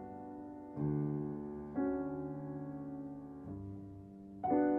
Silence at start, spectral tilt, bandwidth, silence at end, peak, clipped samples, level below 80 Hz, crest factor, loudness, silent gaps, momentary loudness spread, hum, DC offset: 0 s; -12 dB/octave; 2.5 kHz; 0 s; -22 dBFS; under 0.1%; -64 dBFS; 18 dB; -41 LUFS; none; 12 LU; none; under 0.1%